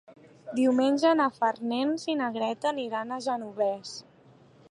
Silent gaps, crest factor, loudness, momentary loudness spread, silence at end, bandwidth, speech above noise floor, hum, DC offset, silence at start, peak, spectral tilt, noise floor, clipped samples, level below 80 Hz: none; 16 dB; -28 LUFS; 13 LU; 0.7 s; 11 kHz; 30 dB; none; under 0.1%; 0.1 s; -12 dBFS; -4.5 dB/octave; -57 dBFS; under 0.1%; -80 dBFS